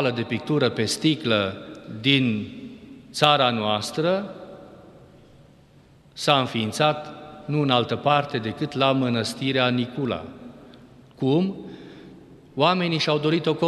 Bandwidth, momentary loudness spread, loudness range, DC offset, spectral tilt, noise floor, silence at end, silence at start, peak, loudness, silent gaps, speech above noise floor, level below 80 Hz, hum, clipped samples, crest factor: 13 kHz; 19 LU; 4 LU; under 0.1%; -5 dB/octave; -53 dBFS; 0 s; 0 s; -2 dBFS; -23 LUFS; none; 31 dB; -62 dBFS; none; under 0.1%; 22 dB